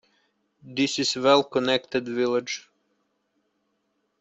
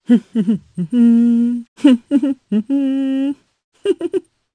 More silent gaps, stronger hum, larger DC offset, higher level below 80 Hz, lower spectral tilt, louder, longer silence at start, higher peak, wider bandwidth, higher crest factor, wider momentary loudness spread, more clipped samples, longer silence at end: second, none vs 1.68-1.76 s, 3.64-3.72 s; neither; neither; about the same, -68 dBFS vs -64 dBFS; second, -3.5 dB/octave vs -7.5 dB/octave; second, -24 LUFS vs -17 LUFS; first, 0.65 s vs 0.1 s; second, -6 dBFS vs 0 dBFS; second, 8.2 kHz vs 9.6 kHz; first, 22 dB vs 16 dB; first, 13 LU vs 10 LU; neither; first, 1.6 s vs 0.35 s